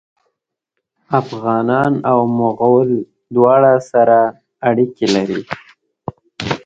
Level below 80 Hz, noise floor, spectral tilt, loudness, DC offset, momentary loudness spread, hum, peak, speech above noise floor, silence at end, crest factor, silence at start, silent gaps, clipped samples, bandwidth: -54 dBFS; -76 dBFS; -6.5 dB/octave; -15 LUFS; under 0.1%; 17 LU; none; 0 dBFS; 63 dB; 0.1 s; 16 dB; 1.1 s; none; under 0.1%; 8 kHz